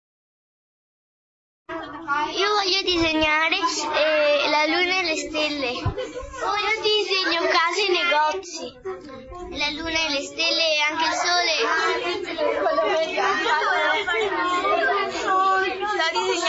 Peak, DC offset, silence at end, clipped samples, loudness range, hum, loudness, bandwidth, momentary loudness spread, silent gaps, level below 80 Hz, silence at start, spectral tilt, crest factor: -6 dBFS; under 0.1%; 0 s; under 0.1%; 3 LU; none; -21 LUFS; 8 kHz; 12 LU; none; -50 dBFS; 1.7 s; -2.5 dB/octave; 18 dB